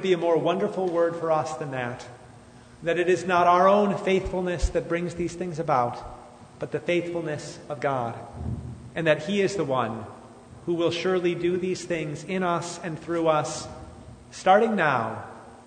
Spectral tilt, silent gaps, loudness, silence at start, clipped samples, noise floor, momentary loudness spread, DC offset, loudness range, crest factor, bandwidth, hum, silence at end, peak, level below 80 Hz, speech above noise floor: -5.5 dB/octave; none; -25 LUFS; 0 s; under 0.1%; -49 dBFS; 17 LU; under 0.1%; 5 LU; 20 dB; 9.6 kHz; none; 0.05 s; -6 dBFS; -44 dBFS; 24 dB